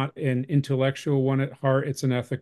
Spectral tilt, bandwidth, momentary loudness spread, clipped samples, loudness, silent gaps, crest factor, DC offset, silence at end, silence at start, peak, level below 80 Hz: -7 dB/octave; 12.5 kHz; 3 LU; under 0.1%; -25 LUFS; none; 14 dB; under 0.1%; 0 s; 0 s; -10 dBFS; -64 dBFS